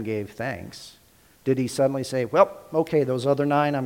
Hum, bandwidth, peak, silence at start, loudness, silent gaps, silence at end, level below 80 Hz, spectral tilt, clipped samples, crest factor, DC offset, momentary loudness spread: none; 17 kHz; -4 dBFS; 0 s; -24 LUFS; none; 0 s; -62 dBFS; -6.5 dB/octave; under 0.1%; 20 dB; under 0.1%; 11 LU